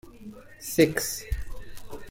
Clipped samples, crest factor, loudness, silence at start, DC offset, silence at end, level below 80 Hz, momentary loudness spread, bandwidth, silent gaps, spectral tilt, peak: under 0.1%; 22 dB; -26 LUFS; 0.05 s; under 0.1%; 0 s; -40 dBFS; 23 LU; 16.5 kHz; none; -4 dB/octave; -8 dBFS